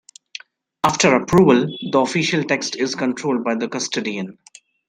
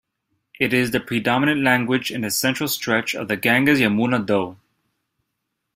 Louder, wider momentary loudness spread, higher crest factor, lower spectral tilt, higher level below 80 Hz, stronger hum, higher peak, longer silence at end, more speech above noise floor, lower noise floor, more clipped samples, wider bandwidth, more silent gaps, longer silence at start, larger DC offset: about the same, -19 LUFS vs -20 LUFS; first, 19 LU vs 6 LU; about the same, 18 dB vs 20 dB; about the same, -4.5 dB/octave vs -4.5 dB/octave; first, -52 dBFS vs -58 dBFS; neither; about the same, -2 dBFS vs -2 dBFS; second, 0.55 s vs 1.2 s; second, 22 dB vs 58 dB; second, -41 dBFS vs -78 dBFS; neither; about the same, 15.5 kHz vs 16 kHz; neither; first, 0.85 s vs 0.6 s; neither